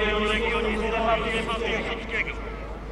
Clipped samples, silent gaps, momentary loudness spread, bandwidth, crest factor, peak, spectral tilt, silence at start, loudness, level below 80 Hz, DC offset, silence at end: under 0.1%; none; 9 LU; 11.5 kHz; 14 dB; -12 dBFS; -5 dB/octave; 0 s; -26 LUFS; -36 dBFS; under 0.1%; 0 s